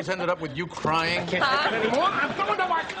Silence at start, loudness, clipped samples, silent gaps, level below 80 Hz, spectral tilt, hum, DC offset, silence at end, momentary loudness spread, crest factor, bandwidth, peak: 0 s; -24 LUFS; under 0.1%; none; -56 dBFS; -4.5 dB/octave; none; under 0.1%; 0 s; 6 LU; 14 dB; 11 kHz; -12 dBFS